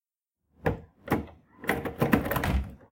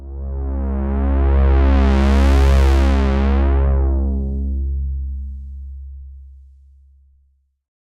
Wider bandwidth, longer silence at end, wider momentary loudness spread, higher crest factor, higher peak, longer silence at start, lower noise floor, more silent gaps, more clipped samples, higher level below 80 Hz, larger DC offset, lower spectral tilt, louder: first, 17 kHz vs 7 kHz; second, 0.15 s vs 1.5 s; second, 8 LU vs 19 LU; first, 26 dB vs 12 dB; about the same, -6 dBFS vs -4 dBFS; first, 0.65 s vs 0 s; first, -84 dBFS vs -60 dBFS; neither; neither; second, -40 dBFS vs -18 dBFS; neither; second, -6.5 dB/octave vs -8 dB/octave; second, -30 LUFS vs -17 LUFS